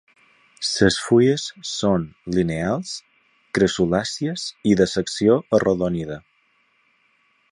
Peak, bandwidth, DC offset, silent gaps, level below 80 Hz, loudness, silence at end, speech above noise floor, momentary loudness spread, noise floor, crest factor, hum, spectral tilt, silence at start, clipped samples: -2 dBFS; 11 kHz; under 0.1%; none; -48 dBFS; -21 LUFS; 1.3 s; 43 dB; 11 LU; -63 dBFS; 20 dB; none; -5 dB/octave; 0.6 s; under 0.1%